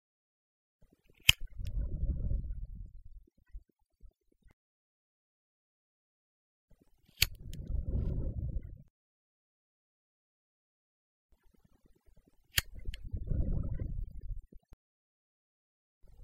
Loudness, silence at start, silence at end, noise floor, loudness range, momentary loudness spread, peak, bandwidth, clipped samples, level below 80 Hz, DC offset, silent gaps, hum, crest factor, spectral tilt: -35 LUFS; 1.15 s; 0 s; -67 dBFS; 11 LU; 22 LU; -4 dBFS; 16 kHz; under 0.1%; -42 dBFS; under 0.1%; 4.53-6.68 s, 8.90-11.29 s, 14.73-16.01 s; none; 36 dB; -2.5 dB/octave